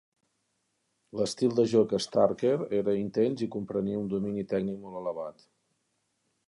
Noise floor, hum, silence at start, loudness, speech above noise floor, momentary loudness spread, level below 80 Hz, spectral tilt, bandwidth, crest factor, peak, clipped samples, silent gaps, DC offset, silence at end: -77 dBFS; none; 1.15 s; -29 LUFS; 49 dB; 11 LU; -66 dBFS; -6.5 dB/octave; 11.5 kHz; 20 dB; -10 dBFS; under 0.1%; none; under 0.1%; 1.15 s